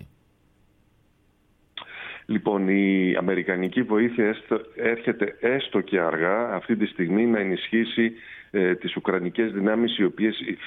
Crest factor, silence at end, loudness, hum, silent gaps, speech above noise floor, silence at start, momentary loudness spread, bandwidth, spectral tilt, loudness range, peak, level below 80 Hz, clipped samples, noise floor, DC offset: 16 dB; 0 s; -24 LUFS; none; none; 39 dB; 0 s; 7 LU; 4.1 kHz; -9 dB/octave; 2 LU; -8 dBFS; -64 dBFS; under 0.1%; -63 dBFS; under 0.1%